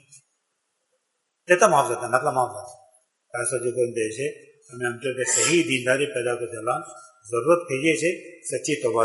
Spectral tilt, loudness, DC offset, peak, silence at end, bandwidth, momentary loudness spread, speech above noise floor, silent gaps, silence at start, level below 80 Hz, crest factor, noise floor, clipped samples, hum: -3.5 dB/octave; -23 LUFS; under 0.1%; -2 dBFS; 0 s; 11.5 kHz; 13 LU; 52 dB; none; 0.15 s; -72 dBFS; 24 dB; -76 dBFS; under 0.1%; none